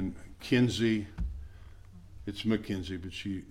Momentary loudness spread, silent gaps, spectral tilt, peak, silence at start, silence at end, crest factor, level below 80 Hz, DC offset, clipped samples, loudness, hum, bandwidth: 17 LU; none; -6 dB/octave; -14 dBFS; 0 s; 0 s; 18 dB; -46 dBFS; under 0.1%; under 0.1%; -32 LUFS; none; 14.5 kHz